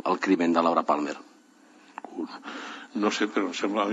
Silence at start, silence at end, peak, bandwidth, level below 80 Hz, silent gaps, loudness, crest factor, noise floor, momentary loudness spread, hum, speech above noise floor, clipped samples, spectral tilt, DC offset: 0.05 s; 0 s; -8 dBFS; 8 kHz; -78 dBFS; none; -27 LUFS; 20 dB; -56 dBFS; 18 LU; none; 29 dB; under 0.1%; -4.5 dB/octave; under 0.1%